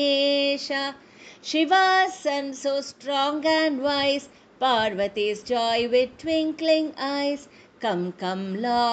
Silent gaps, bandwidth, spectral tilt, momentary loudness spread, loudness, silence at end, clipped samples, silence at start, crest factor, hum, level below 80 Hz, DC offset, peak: none; 9 kHz; -4 dB/octave; 8 LU; -24 LUFS; 0 s; under 0.1%; 0 s; 16 dB; none; -64 dBFS; under 0.1%; -8 dBFS